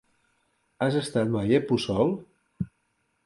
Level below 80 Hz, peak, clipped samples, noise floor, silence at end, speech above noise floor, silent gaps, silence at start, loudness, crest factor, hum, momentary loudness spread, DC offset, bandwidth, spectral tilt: -56 dBFS; -8 dBFS; under 0.1%; -73 dBFS; 0.6 s; 49 dB; none; 0.8 s; -27 LUFS; 18 dB; none; 13 LU; under 0.1%; 11.5 kHz; -6.5 dB/octave